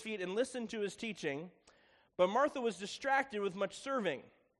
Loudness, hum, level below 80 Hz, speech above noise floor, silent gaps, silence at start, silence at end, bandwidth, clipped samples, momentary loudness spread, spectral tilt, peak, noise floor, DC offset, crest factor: -37 LUFS; none; -78 dBFS; 31 dB; none; 0 s; 0.3 s; 11.5 kHz; under 0.1%; 9 LU; -4 dB/octave; -18 dBFS; -68 dBFS; under 0.1%; 20 dB